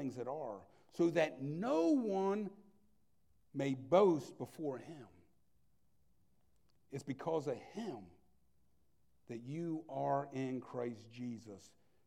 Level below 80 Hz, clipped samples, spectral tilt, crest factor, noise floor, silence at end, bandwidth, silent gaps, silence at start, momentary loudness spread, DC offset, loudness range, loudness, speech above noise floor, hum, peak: -80 dBFS; under 0.1%; -7 dB/octave; 24 dB; -78 dBFS; 0.4 s; 13.5 kHz; none; 0 s; 18 LU; under 0.1%; 10 LU; -38 LUFS; 40 dB; none; -16 dBFS